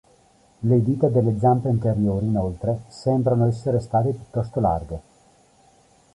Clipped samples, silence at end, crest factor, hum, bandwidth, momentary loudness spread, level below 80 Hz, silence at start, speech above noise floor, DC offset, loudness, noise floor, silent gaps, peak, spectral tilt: under 0.1%; 1.15 s; 16 dB; none; 11 kHz; 8 LU; -44 dBFS; 0.6 s; 36 dB; under 0.1%; -22 LUFS; -57 dBFS; none; -6 dBFS; -10 dB/octave